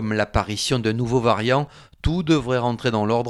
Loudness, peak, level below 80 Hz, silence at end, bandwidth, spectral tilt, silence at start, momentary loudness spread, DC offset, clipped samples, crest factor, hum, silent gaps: -22 LUFS; -4 dBFS; -38 dBFS; 0 s; 13 kHz; -5.5 dB/octave; 0 s; 5 LU; under 0.1%; under 0.1%; 18 dB; none; none